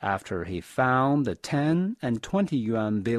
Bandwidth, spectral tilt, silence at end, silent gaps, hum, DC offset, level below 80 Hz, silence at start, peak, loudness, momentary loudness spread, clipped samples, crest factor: 13.5 kHz; -7 dB/octave; 0 s; none; none; under 0.1%; -56 dBFS; 0 s; -10 dBFS; -26 LUFS; 8 LU; under 0.1%; 16 dB